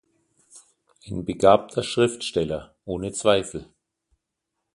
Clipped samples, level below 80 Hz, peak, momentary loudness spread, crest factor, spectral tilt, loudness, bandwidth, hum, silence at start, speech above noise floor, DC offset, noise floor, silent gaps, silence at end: under 0.1%; -52 dBFS; -2 dBFS; 16 LU; 24 dB; -4.5 dB/octave; -23 LUFS; 11.5 kHz; none; 0.55 s; 59 dB; under 0.1%; -81 dBFS; none; 1.1 s